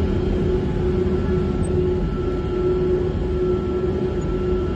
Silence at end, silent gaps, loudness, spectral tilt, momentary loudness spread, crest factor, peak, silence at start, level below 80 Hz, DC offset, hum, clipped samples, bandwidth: 0 s; none; -22 LUFS; -9 dB/octave; 3 LU; 10 dB; -10 dBFS; 0 s; -28 dBFS; under 0.1%; none; under 0.1%; 8.8 kHz